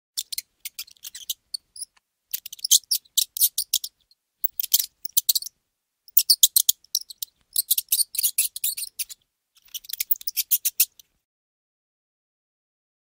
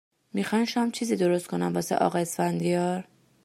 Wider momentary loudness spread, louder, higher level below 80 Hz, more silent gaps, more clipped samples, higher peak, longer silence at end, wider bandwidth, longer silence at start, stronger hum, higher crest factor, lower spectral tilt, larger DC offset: first, 19 LU vs 5 LU; first, -21 LUFS vs -27 LUFS; about the same, -74 dBFS vs -72 dBFS; neither; neither; first, 0 dBFS vs -8 dBFS; first, 2.2 s vs 0.4 s; about the same, 17 kHz vs 15.5 kHz; second, 0.15 s vs 0.35 s; neither; first, 26 dB vs 18 dB; second, 6 dB/octave vs -5.5 dB/octave; neither